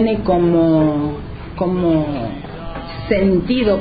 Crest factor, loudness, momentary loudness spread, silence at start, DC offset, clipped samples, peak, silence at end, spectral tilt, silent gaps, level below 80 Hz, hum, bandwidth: 14 dB; -17 LUFS; 16 LU; 0 s; under 0.1%; under 0.1%; -2 dBFS; 0 s; -11.5 dB/octave; none; -34 dBFS; none; 5 kHz